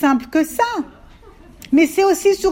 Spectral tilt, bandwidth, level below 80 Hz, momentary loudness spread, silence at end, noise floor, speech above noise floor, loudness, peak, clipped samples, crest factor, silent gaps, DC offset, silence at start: -3.5 dB/octave; 16.5 kHz; -48 dBFS; 8 LU; 0 s; -43 dBFS; 27 dB; -17 LUFS; -4 dBFS; under 0.1%; 14 dB; none; under 0.1%; 0 s